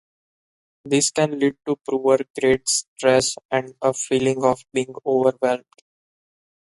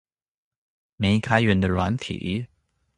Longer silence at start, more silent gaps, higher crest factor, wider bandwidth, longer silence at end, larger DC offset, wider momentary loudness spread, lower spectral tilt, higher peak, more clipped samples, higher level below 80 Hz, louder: second, 0.85 s vs 1 s; first, 2.30-2.34 s, 2.88-2.96 s, 3.45-3.49 s vs none; about the same, 18 dB vs 22 dB; about the same, 11.5 kHz vs 11 kHz; first, 1.1 s vs 0.5 s; neither; second, 7 LU vs 10 LU; second, -3.5 dB/octave vs -6.5 dB/octave; about the same, -4 dBFS vs -2 dBFS; neither; second, -58 dBFS vs -42 dBFS; about the same, -21 LUFS vs -23 LUFS